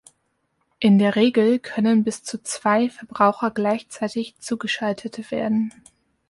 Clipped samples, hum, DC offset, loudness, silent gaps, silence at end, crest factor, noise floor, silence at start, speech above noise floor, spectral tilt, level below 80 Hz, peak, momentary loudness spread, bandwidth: under 0.1%; none; under 0.1%; -21 LUFS; none; 0.6 s; 18 dB; -71 dBFS; 0.8 s; 50 dB; -5.5 dB/octave; -66 dBFS; -4 dBFS; 12 LU; 11.5 kHz